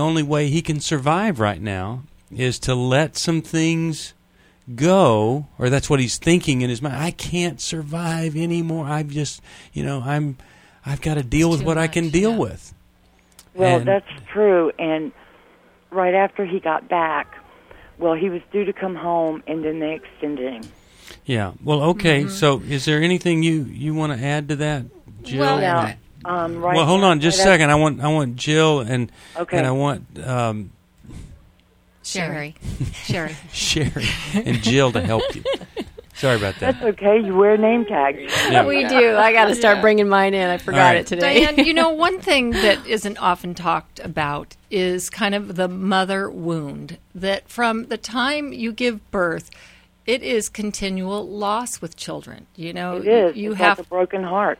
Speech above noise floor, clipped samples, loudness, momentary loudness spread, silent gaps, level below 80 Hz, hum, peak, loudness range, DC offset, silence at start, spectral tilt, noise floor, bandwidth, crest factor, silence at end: 36 dB; under 0.1%; -19 LUFS; 14 LU; none; -44 dBFS; none; 0 dBFS; 9 LU; under 0.1%; 0 s; -5 dB/octave; -56 dBFS; 16 kHz; 20 dB; 0.05 s